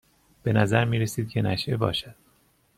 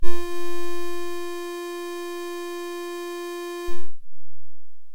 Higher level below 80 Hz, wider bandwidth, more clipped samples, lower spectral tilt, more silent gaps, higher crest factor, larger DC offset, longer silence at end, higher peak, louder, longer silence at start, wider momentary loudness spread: second, -54 dBFS vs -42 dBFS; second, 14.5 kHz vs 17 kHz; neither; about the same, -6 dB/octave vs -5 dB/octave; neither; about the same, 18 dB vs 16 dB; neither; first, 0.65 s vs 0 s; second, -8 dBFS vs -2 dBFS; first, -25 LUFS vs -32 LUFS; first, 0.45 s vs 0 s; first, 10 LU vs 1 LU